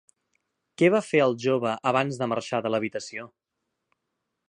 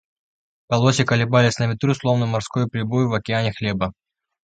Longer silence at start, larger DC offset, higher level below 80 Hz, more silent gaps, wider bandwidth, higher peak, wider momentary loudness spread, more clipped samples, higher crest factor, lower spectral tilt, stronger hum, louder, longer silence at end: about the same, 0.8 s vs 0.7 s; neither; second, -74 dBFS vs -50 dBFS; neither; first, 11 kHz vs 9 kHz; second, -8 dBFS vs -2 dBFS; first, 11 LU vs 7 LU; neither; about the same, 20 dB vs 20 dB; about the same, -5.5 dB/octave vs -6 dB/octave; neither; second, -25 LUFS vs -20 LUFS; first, 1.2 s vs 0.55 s